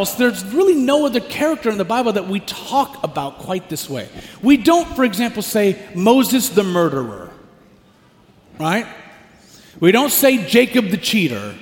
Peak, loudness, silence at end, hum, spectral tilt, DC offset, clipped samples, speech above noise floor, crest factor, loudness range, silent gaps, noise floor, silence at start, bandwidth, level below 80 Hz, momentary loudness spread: 0 dBFS; -17 LUFS; 0.05 s; none; -4.5 dB/octave; under 0.1%; under 0.1%; 34 dB; 18 dB; 5 LU; none; -51 dBFS; 0 s; 17 kHz; -50 dBFS; 12 LU